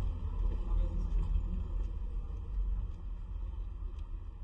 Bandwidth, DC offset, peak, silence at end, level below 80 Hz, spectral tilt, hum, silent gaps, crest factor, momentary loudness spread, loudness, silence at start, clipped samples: 3.5 kHz; under 0.1%; -20 dBFS; 0 s; -34 dBFS; -9 dB/octave; none; none; 14 dB; 8 LU; -40 LUFS; 0 s; under 0.1%